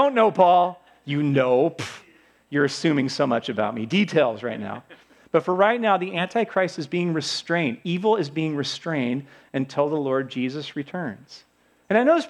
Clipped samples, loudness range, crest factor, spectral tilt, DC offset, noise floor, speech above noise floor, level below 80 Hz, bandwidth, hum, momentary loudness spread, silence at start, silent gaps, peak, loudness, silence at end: under 0.1%; 4 LU; 20 dB; -6 dB/octave; under 0.1%; -55 dBFS; 32 dB; -74 dBFS; 11.5 kHz; none; 13 LU; 0 s; none; -4 dBFS; -23 LUFS; 0 s